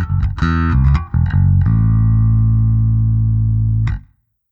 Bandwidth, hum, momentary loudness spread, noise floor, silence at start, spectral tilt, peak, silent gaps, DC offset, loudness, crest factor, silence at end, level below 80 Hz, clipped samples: 4.9 kHz; none; 4 LU; -49 dBFS; 0 s; -9.5 dB/octave; -2 dBFS; none; under 0.1%; -15 LUFS; 10 dB; 0.5 s; -20 dBFS; under 0.1%